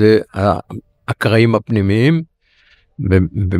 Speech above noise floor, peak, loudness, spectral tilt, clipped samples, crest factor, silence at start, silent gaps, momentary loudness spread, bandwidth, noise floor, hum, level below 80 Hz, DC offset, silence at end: 40 dB; 0 dBFS; -15 LUFS; -8 dB/octave; under 0.1%; 14 dB; 0 s; none; 14 LU; 13.5 kHz; -54 dBFS; none; -40 dBFS; under 0.1%; 0 s